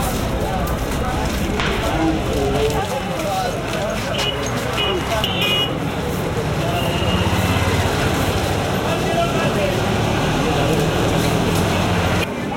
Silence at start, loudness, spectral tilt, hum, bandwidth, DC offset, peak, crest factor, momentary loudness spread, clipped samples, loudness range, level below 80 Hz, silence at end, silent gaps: 0 s; -19 LUFS; -5 dB/octave; none; 17 kHz; under 0.1%; -4 dBFS; 16 dB; 4 LU; under 0.1%; 2 LU; -30 dBFS; 0 s; none